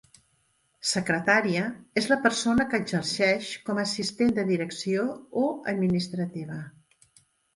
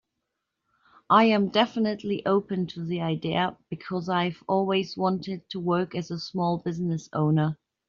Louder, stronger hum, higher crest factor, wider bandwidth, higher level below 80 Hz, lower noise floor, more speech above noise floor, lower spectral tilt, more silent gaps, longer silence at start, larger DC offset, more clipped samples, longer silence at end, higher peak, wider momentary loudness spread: about the same, -26 LUFS vs -26 LUFS; neither; about the same, 22 dB vs 20 dB; first, 11.5 kHz vs 7.2 kHz; first, -60 dBFS vs -66 dBFS; second, -69 dBFS vs -82 dBFS; second, 43 dB vs 56 dB; about the same, -4.5 dB/octave vs -5 dB/octave; neither; second, 0.85 s vs 1.1 s; neither; neither; first, 0.85 s vs 0.35 s; about the same, -6 dBFS vs -6 dBFS; about the same, 9 LU vs 10 LU